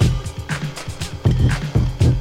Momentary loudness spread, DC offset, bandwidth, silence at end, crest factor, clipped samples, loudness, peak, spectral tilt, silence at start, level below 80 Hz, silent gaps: 11 LU; under 0.1%; 14 kHz; 0 s; 16 dB; under 0.1%; -21 LUFS; -4 dBFS; -6.5 dB/octave; 0 s; -26 dBFS; none